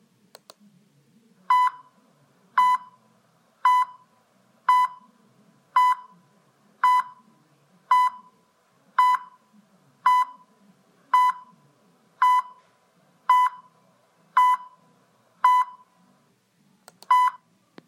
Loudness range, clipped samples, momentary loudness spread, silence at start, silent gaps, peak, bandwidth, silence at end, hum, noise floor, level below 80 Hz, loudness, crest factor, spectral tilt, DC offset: 2 LU; under 0.1%; 8 LU; 1.5 s; none; -8 dBFS; 16 kHz; 0.55 s; none; -64 dBFS; under -90 dBFS; -22 LUFS; 18 dB; 0 dB/octave; under 0.1%